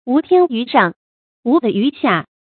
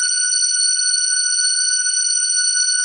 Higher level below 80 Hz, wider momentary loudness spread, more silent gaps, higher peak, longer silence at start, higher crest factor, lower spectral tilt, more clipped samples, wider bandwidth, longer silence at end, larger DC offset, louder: first, -64 dBFS vs -74 dBFS; first, 5 LU vs 1 LU; first, 0.96-1.43 s vs none; first, 0 dBFS vs -6 dBFS; about the same, 0.05 s vs 0 s; about the same, 16 dB vs 12 dB; first, -11 dB/octave vs 10 dB/octave; neither; second, 4.5 kHz vs 11.5 kHz; first, 0.3 s vs 0 s; neither; about the same, -16 LUFS vs -14 LUFS